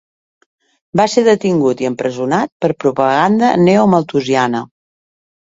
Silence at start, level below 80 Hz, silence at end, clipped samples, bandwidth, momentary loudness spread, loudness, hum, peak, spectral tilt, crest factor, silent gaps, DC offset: 0.95 s; -54 dBFS; 0.75 s; under 0.1%; 7.8 kHz; 8 LU; -14 LUFS; none; 0 dBFS; -6 dB/octave; 14 dB; 2.52-2.60 s; under 0.1%